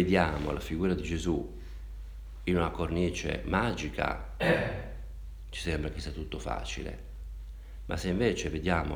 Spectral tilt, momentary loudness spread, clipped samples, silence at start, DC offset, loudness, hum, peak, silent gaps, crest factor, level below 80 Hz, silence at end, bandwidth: -6 dB/octave; 17 LU; under 0.1%; 0 s; under 0.1%; -32 LUFS; none; -10 dBFS; none; 22 dB; -40 dBFS; 0 s; 19.5 kHz